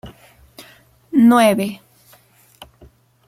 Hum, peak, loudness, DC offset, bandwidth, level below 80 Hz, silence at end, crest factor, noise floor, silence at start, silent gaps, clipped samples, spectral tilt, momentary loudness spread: none; -2 dBFS; -15 LUFS; under 0.1%; 15 kHz; -56 dBFS; 1.5 s; 18 dB; -52 dBFS; 0.05 s; none; under 0.1%; -5.5 dB/octave; 16 LU